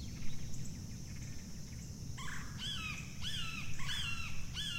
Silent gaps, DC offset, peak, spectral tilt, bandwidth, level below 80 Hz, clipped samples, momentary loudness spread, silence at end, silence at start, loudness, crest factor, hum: none; under 0.1%; -24 dBFS; -3 dB/octave; 16 kHz; -50 dBFS; under 0.1%; 9 LU; 0 s; 0 s; -43 LUFS; 14 dB; none